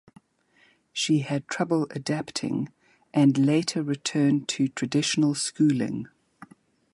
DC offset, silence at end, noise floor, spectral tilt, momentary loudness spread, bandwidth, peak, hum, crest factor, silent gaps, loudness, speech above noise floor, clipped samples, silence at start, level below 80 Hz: under 0.1%; 0.5 s; -63 dBFS; -5 dB/octave; 9 LU; 11.5 kHz; -10 dBFS; none; 16 dB; none; -25 LUFS; 39 dB; under 0.1%; 0.95 s; -68 dBFS